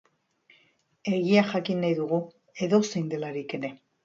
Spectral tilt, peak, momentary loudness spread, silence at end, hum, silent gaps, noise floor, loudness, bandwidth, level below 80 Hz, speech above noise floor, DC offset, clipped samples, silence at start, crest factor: -6 dB/octave; -6 dBFS; 13 LU; 0.3 s; none; none; -66 dBFS; -27 LUFS; 7.6 kHz; -72 dBFS; 40 dB; under 0.1%; under 0.1%; 1.05 s; 20 dB